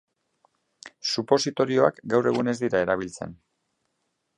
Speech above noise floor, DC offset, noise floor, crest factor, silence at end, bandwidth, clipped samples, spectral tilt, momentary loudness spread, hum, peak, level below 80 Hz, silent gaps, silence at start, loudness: 53 dB; under 0.1%; -76 dBFS; 22 dB; 1.05 s; 11.5 kHz; under 0.1%; -4.5 dB/octave; 12 LU; none; -4 dBFS; -62 dBFS; none; 0.85 s; -24 LUFS